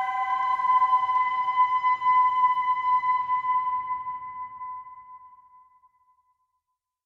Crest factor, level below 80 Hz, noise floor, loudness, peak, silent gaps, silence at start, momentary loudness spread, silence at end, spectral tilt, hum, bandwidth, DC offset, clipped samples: 14 dB; -70 dBFS; -81 dBFS; -23 LUFS; -12 dBFS; none; 0 s; 16 LU; 1.8 s; -2 dB/octave; none; 5.4 kHz; under 0.1%; under 0.1%